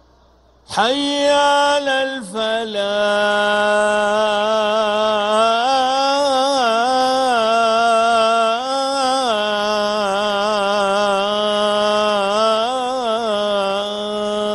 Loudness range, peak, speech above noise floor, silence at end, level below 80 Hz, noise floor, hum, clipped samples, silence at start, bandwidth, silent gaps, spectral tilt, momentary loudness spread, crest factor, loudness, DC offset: 2 LU; -2 dBFS; 35 dB; 0 s; -56 dBFS; -52 dBFS; none; under 0.1%; 0.7 s; 12 kHz; none; -2.5 dB/octave; 6 LU; 14 dB; -17 LUFS; under 0.1%